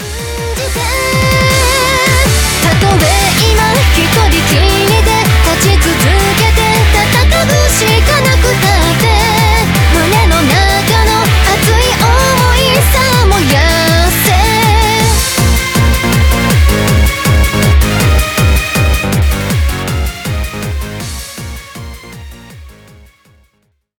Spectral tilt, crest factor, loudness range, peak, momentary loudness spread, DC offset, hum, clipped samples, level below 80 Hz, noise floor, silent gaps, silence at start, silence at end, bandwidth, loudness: -4 dB/octave; 10 dB; 7 LU; 0 dBFS; 9 LU; 0.1%; none; under 0.1%; -14 dBFS; -59 dBFS; none; 0 s; 1.3 s; over 20 kHz; -9 LUFS